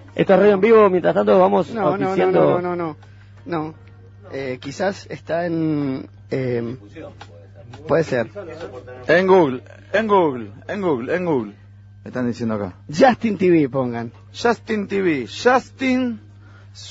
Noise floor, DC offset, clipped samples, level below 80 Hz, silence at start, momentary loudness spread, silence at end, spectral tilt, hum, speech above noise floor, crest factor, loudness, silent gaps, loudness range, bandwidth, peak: -43 dBFS; under 0.1%; under 0.1%; -56 dBFS; 0 s; 18 LU; 0 s; -7 dB/octave; none; 24 dB; 18 dB; -19 LUFS; none; 8 LU; 8 kHz; 0 dBFS